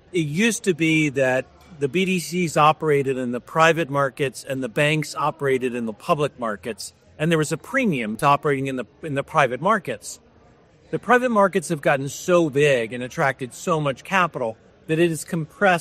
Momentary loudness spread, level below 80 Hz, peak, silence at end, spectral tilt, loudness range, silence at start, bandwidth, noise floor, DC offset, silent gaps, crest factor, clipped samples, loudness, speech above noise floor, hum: 11 LU; -60 dBFS; -2 dBFS; 0 s; -5 dB/octave; 3 LU; 0.15 s; 15 kHz; -53 dBFS; under 0.1%; none; 20 dB; under 0.1%; -22 LUFS; 32 dB; none